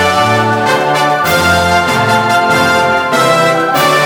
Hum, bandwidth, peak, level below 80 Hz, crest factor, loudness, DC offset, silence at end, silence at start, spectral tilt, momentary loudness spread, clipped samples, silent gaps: none; over 20 kHz; 0 dBFS; -40 dBFS; 10 dB; -10 LUFS; under 0.1%; 0 s; 0 s; -4 dB/octave; 2 LU; under 0.1%; none